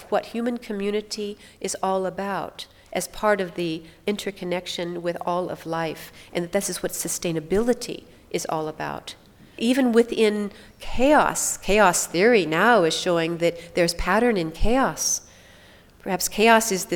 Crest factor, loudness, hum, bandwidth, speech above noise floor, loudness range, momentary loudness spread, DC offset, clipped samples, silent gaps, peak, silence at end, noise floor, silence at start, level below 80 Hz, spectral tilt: 20 dB; -23 LUFS; none; 19.5 kHz; 28 dB; 8 LU; 14 LU; under 0.1%; under 0.1%; none; -2 dBFS; 0 s; -50 dBFS; 0 s; -40 dBFS; -3.5 dB/octave